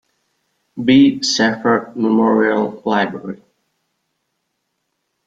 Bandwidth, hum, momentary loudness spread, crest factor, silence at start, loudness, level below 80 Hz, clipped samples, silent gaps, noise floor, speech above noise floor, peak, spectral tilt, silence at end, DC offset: 7.8 kHz; none; 18 LU; 16 dB; 0.75 s; -15 LUFS; -60 dBFS; under 0.1%; none; -72 dBFS; 57 dB; -2 dBFS; -4.5 dB/octave; 1.9 s; under 0.1%